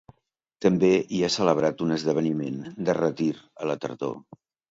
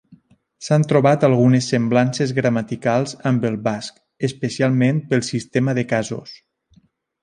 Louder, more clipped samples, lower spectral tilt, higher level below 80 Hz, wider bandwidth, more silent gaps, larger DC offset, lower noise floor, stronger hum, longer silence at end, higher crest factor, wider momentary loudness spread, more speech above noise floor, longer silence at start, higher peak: second, -25 LUFS vs -19 LUFS; neither; about the same, -6 dB/octave vs -6.5 dB/octave; about the same, -62 dBFS vs -58 dBFS; second, 7.8 kHz vs 10.5 kHz; neither; neither; first, -74 dBFS vs -57 dBFS; neither; second, 0.5 s vs 0.9 s; about the same, 20 dB vs 18 dB; about the same, 11 LU vs 11 LU; first, 49 dB vs 39 dB; first, 0.6 s vs 0.1 s; second, -6 dBFS vs -2 dBFS